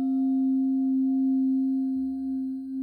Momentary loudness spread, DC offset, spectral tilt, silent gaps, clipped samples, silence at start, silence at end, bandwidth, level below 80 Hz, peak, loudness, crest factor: 6 LU; under 0.1%; -9.5 dB/octave; none; under 0.1%; 0 s; 0 s; 0.8 kHz; -66 dBFS; -20 dBFS; -26 LUFS; 6 dB